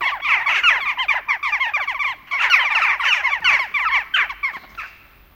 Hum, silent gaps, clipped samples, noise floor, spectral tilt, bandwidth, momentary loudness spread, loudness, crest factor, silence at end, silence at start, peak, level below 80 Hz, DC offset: none; none; under 0.1%; -45 dBFS; 1 dB/octave; 17 kHz; 11 LU; -17 LUFS; 20 dB; 0.45 s; 0 s; 0 dBFS; -54 dBFS; under 0.1%